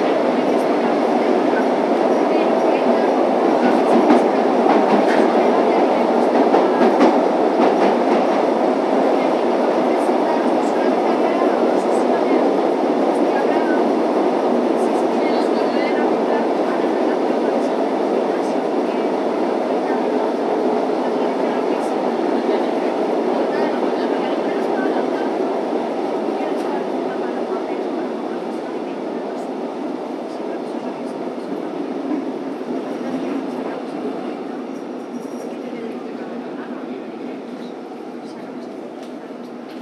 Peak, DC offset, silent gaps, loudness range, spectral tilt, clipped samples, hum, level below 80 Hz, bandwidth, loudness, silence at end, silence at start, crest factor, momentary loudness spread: 0 dBFS; under 0.1%; none; 12 LU; -6 dB/octave; under 0.1%; none; -76 dBFS; 12.5 kHz; -19 LUFS; 0 s; 0 s; 18 dB; 14 LU